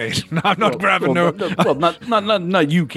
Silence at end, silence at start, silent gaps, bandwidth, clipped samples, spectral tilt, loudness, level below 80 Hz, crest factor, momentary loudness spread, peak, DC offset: 0 s; 0 s; none; 13 kHz; under 0.1%; -5.5 dB/octave; -17 LUFS; -56 dBFS; 16 dB; 3 LU; 0 dBFS; under 0.1%